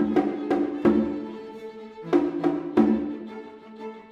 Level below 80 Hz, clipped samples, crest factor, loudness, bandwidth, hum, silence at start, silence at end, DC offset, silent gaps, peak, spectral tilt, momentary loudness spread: -56 dBFS; under 0.1%; 18 dB; -24 LUFS; 7 kHz; none; 0 s; 0.05 s; under 0.1%; none; -6 dBFS; -8.5 dB/octave; 18 LU